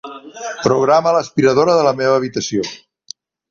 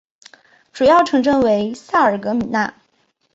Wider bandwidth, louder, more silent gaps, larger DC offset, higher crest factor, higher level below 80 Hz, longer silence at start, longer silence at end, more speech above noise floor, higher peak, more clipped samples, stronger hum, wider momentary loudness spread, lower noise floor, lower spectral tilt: about the same, 7.4 kHz vs 8 kHz; about the same, -15 LUFS vs -16 LUFS; neither; neither; about the same, 16 dB vs 14 dB; about the same, -56 dBFS vs -52 dBFS; second, 0.05 s vs 0.75 s; about the same, 0.75 s vs 0.65 s; second, 25 dB vs 48 dB; about the same, 0 dBFS vs -2 dBFS; neither; neither; first, 23 LU vs 8 LU; second, -40 dBFS vs -63 dBFS; about the same, -5 dB/octave vs -5.5 dB/octave